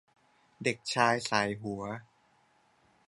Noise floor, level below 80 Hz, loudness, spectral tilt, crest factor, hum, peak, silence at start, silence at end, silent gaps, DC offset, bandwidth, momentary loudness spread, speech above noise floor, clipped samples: -68 dBFS; -70 dBFS; -31 LUFS; -4 dB/octave; 26 dB; none; -10 dBFS; 0.6 s; 1.05 s; none; under 0.1%; 11.5 kHz; 13 LU; 37 dB; under 0.1%